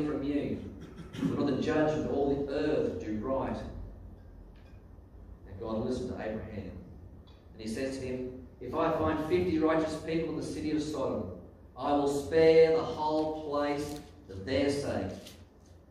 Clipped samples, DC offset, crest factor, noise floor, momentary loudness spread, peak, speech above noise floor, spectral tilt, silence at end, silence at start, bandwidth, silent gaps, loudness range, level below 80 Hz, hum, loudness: under 0.1%; under 0.1%; 20 dB; -55 dBFS; 18 LU; -12 dBFS; 25 dB; -6.5 dB/octave; 0.2 s; 0 s; 13.5 kHz; none; 11 LU; -52 dBFS; none; -31 LUFS